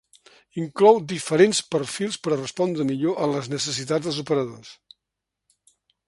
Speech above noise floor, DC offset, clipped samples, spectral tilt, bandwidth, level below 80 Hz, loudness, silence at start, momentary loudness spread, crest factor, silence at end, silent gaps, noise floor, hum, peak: 62 dB; under 0.1%; under 0.1%; -4.5 dB/octave; 11.5 kHz; -66 dBFS; -23 LUFS; 0.55 s; 13 LU; 22 dB; 1.35 s; none; -84 dBFS; none; -2 dBFS